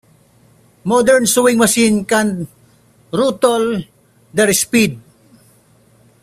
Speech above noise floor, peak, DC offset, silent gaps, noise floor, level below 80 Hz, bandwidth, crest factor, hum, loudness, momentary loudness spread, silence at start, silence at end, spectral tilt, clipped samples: 37 dB; 0 dBFS; under 0.1%; none; -51 dBFS; -52 dBFS; 16 kHz; 16 dB; none; -14 LUFS; 13 LU; 0.85 s; 1.25 s; -3.5 dB/octave; under 0.1%